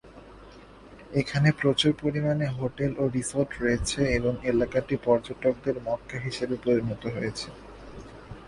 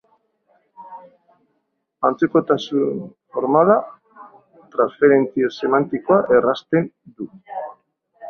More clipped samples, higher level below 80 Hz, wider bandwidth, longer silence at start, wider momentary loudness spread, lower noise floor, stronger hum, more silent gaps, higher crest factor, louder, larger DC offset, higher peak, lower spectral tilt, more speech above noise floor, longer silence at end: neither; first, -46 dBFS vs -64 dBFS; first, 11.5 kHz vs 6.6 kHz; second, 0.05 s vs 0.8 s; second, 13 LU vs 20 LU; second, -48 dBFS vs -72 dBFS; neither; neither; about the same, 20 dB vs 20 dB; second, -27 LUFS vs -18 LUFS; neither; second, -8 dBFS vs -2 dBFS; second, -5.5 dB/octave vs -7.5 dB/octave; second, 22 dB vs 54 dB; about the same, 0 s vs 0 s